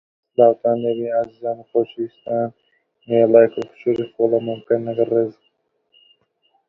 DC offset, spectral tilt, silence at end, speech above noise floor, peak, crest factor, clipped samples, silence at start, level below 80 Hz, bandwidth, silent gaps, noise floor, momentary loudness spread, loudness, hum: under 0.1%; -9 dB/octave; 1.35 s; 49 dB; 0 dBFS; 20 dB; under 0.1%; 0.4 s; -66 dBFS; 4.1 kHz; none; -67 dBFS; 12 LU; -19 LUFS; none